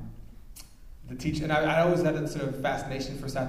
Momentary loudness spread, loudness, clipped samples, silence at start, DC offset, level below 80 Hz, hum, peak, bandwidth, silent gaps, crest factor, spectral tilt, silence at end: 25 LU; -28 LUFS; under 0.1%; 0 s; under 0.1%; -46 dBFS; none; -12 dBFS; 15.5 kHz; none; 18 dB; -6 dB/octave; 0 s